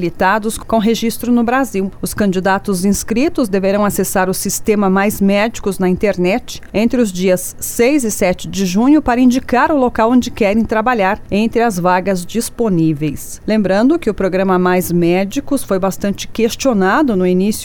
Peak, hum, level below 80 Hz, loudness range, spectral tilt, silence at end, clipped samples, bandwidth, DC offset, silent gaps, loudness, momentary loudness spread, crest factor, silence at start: -2 dBFS; none; -36 dBFS; 2 LU; -5.5 dB/octave; 0 s; under 0.1%; 19.5 kHz; under 0.1%; none; -15 LUFS; 5 LU; 12 dB; 0 s